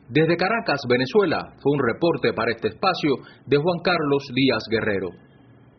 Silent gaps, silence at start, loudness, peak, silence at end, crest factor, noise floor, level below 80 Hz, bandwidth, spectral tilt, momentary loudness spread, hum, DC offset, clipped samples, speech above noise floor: none; 0.1 s; -22 LUFS; -6 dBFS; 0.6 s; 16 dB; -51 dBFS; -56 dBFS; 6.4 kHz; -4 dB/octave; 5 LU; none; under 0.1%; under 0.1%; 29 dB